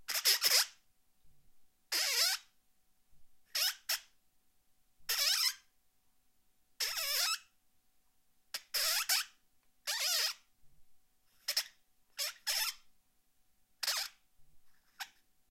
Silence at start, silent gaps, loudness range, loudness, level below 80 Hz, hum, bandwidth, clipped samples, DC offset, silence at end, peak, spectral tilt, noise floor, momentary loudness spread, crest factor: 0 s; none; 4 LU; -33 LUFS; -78 dBFS; none; 16.5 kHz; under 0.1%; under 0.1%; 0.45 s; -14 dBFS; 4 dB/octave; -75 dBFS; 18 LU; 24 dB